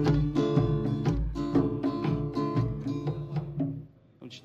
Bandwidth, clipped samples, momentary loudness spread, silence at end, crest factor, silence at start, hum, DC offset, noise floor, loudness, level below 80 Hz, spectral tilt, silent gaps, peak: 7.4 kHz; under 0.1%; 8 LU; 0.05 s; 18 dB; 0 s; none; under 0.1%; -49 dBFS; -29 LUFS; -40 dBFS; -9 dB/octave; none; -10 dBFS